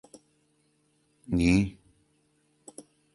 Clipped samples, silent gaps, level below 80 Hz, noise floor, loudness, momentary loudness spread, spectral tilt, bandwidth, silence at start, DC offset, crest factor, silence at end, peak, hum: under 0.1%; none; -46 dBFS; -70 dBFS; -26 LUFS; 25 LU; -6.5 dB/octave; 11.5 kHz; 1.3 s; under 0.1%; 22 dB; 1.45 s; -10 dBFS; none